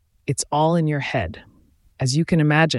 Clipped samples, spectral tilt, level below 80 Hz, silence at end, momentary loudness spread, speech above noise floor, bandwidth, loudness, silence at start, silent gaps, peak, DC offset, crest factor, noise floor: under 0.1%; -5.5 dB/octave; -48 dBFS; 0 s; 9 LU; 29 dB; 12 kHz; -21 LUFS; 0.3 s; none; -6 dBFS; under 0.1%; 16 dB; -49 dBFS